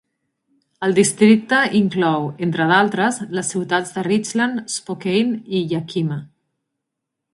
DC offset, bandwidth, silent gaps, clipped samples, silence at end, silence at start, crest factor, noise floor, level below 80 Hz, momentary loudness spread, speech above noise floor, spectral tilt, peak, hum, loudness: under 0.1%; 11.5 kHz; none; under 0.1%; 1.1 s; 0.8 s; 20 dB; -80 dBFS; -62 dBFS; 10 LU; 62 dB; -4.5 dB/octave; 0 dBFS; none; -18 LUFS